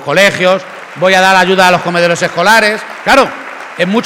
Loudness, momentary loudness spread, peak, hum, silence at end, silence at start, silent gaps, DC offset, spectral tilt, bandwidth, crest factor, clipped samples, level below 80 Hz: -9 LUFS; 10 LU; 0 dBFS; none; 0 s; 0 s; none; 0.1%; -3.5 dB/octave; 19 kHz; 10 dB; 0.8%; -46 dBFS